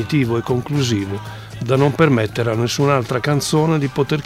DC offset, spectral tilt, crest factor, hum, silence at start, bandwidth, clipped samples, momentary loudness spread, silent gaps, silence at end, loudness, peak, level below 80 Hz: under 0.1%; -6 dB/octave; 16 dB; none; 0 s; 15.5 kHz; under 0.1%; 8 LU; none; 0 s; -18 LUFS; -2 dBFS; -48 dBFS